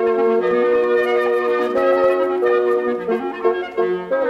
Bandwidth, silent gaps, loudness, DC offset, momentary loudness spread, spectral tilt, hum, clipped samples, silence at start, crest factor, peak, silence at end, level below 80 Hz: 6.4 kHz; none; -18 LUFS; under 0.1%; 5 LU; -6.5 dB/octave; none; under 0.1%; 0 s; 12 dB; -4 dBFS; 0 s; -58 dBFS